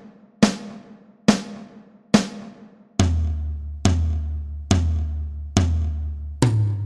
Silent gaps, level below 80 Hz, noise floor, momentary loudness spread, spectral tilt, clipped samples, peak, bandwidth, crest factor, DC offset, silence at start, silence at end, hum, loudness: none; -30 dBFS; -46 dBFS; 14 LU; -6 dB/octave; under 0.1%; 0 dBFS; 11.5 kHz; 22 dB; under 0.1%; 0 s; 0 s; none; -23 LUFS